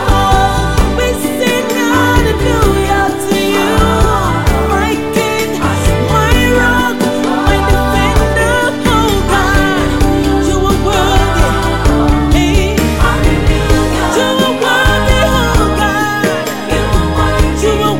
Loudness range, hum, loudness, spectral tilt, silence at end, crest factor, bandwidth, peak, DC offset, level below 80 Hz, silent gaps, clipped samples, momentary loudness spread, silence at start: 1 LU; none; -12 LUFS; -5 dB/octave; 0 s; 10 dB; 17 kHz; 0 dBFS; 0.8%; -16 dBFS; none; under 0.1%; 3 LU; 0 s